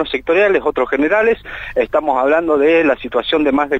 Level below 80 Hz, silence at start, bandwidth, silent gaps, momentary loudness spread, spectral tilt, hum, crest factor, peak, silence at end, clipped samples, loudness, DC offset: -42 dBFS; 0 s; 7.8 kHz; none; 5 LU; -6 dB/octave; none; 12 dB; -2 dBFS; 0 s; under 0.1%; -15 LUFS; under 0.1%